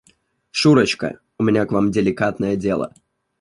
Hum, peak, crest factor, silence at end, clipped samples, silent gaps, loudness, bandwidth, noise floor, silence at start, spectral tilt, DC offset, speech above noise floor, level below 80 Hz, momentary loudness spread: none; -2 dBFS; 18 dB; 0.55 s; under 0.1%; none; -19 LUFS; 11.5 kHz; -60 dBFS; 0.55 s; -6 dB/octave; under 0.1%; 42 dB; -50 dBFS; 11 LU